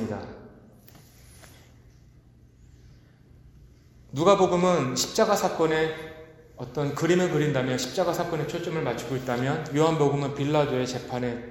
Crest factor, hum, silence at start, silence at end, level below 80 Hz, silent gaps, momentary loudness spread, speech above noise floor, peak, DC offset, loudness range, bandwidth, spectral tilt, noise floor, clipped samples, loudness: 22 dB; none; 0 s; 0 s; -56 dBFS; none; 14 LU; 29 dB; -4 dBFS; under 0.1%; 3 LU; 17 kHz; -5.5 dB/octave; -54 dBFS; under 0.1%; -25 LUFS